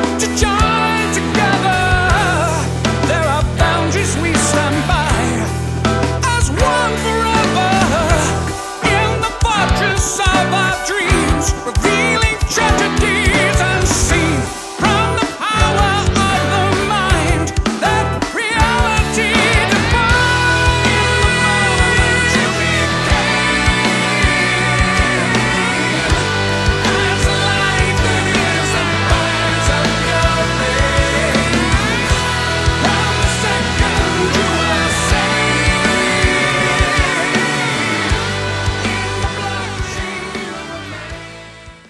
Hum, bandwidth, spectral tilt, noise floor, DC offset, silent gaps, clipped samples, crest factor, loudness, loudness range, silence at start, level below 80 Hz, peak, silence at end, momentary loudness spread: none; 12 kHz; -4 dB/octave; -36 dBFS; under 0.1%; none; under 0.1%; 14 dB; -14 LUFS; 3 LU; 0 s; -24 dBFS; 0 dBFS; 0.15 s; 5 LU